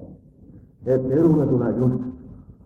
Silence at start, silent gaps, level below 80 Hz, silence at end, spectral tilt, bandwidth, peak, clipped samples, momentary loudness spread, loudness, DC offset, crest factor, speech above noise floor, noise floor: 0 s; none; -48 dBFS; 0.15 s; -11.5 dB/octave; 2.9 kHz; -8 dBFS; under 0.1%; 16 LU; -20 LUFS; under 0.1%; 14 dB; 28 dB; -47 dBFS